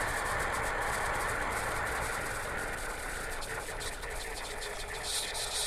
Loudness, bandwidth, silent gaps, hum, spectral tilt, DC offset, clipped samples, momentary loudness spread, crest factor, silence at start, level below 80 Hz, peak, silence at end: -34 LUFS; 16 kHz; none; none; -2 dB/octave; under 0.1%; under 0.1%; 6 LU; 16 dB; 0 s; -44 dBFS; -20 dBFS; 0 s